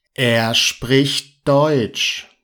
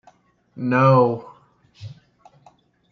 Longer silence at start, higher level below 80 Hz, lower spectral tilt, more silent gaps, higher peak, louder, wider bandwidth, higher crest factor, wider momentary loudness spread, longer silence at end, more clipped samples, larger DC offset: second, 0.2 s vs 0.55 s; first, -50 dBFS vs -66 dBFS; second, -4 dB/octave vs -9 dB/octave; neither; about the same, -2 dBFS vs -4 dBFS; about the same, -16 LUFS vs -18 LUFS; first, 19 kHz vs 6.4 kHz; about the same, 16 dB vs 20 dB; second, 5 LU vs 26 LU; second, 0.2 s vs 1 s; neither; neither